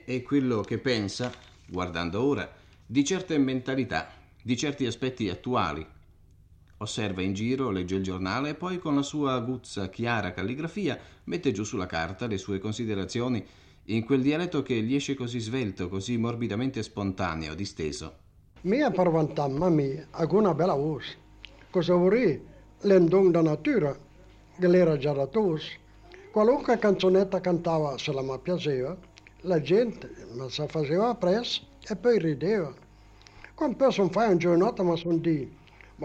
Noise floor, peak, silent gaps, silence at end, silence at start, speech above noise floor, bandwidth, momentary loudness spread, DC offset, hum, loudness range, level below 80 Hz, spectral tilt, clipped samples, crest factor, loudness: -56 dBFS; -10 dBFS; none; 0 s; 0.05 s; 29 dB; 9.4 kHz; 12 LU; under 0.1%; none; 7 LU; -56 dBFS; -6 dB/octave; under 0.1%; 16 dB; -27 LUFS